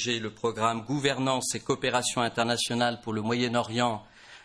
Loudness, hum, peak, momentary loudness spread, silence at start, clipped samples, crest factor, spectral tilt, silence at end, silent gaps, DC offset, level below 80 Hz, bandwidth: -28 LUFS; none; -10 dBFS; 4 LU; 0 s; under 0.1%; 18 dB; -3.5 dB/octave; 0.05 s; none; under 0.1%; -62 dBFS; 11 kHz